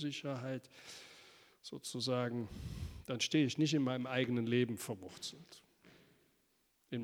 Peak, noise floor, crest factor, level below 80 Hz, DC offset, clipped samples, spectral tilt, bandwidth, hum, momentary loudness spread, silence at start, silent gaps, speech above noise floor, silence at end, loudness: -20 dBFS; -77 dBFS; 20 dB; -62 dBFS; under 0.1%; under 0.1%; -5 dB/octave; over 20 kHz; none; 20 LU; 0 s; none; 39 dB; 0 s; -38 LUFS